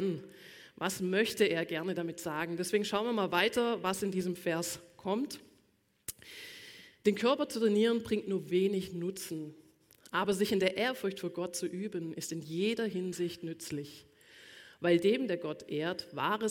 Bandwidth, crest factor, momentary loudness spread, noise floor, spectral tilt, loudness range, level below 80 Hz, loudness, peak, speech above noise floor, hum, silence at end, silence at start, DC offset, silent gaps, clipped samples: 17 kHz; 20 dB; 16 LU; -72 dBFS; -4.5 dB/octave; 5 LU; -72 dBFS; -33 LUFS; -14 dBFS; 39 dB; none; 0 s; 0 s; under 0.1%; none; under 0.1%